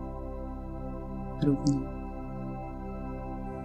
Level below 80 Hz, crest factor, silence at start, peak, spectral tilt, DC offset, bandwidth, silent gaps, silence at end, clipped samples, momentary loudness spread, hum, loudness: -40 dBFS; 20 dB; 0 s; -12 dBFS; -8 dB/octave; under 0.1%; 9.2 kHz; none; 0 s; under 0.1%; 11 LU; none; -35 LUFS